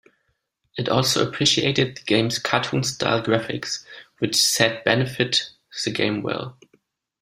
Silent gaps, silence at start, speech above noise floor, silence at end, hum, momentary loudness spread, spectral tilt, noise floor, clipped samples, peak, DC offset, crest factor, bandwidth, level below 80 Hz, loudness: none; 0.75 s; 50 dB; 0.7 s; none; 11 LU; -3.5 dB/octave; -72 dBFS; under 0.1%; 0 dBFS; under 0.1%; 22 dB; 16 kHz; -58 dBFS; -21 LUFS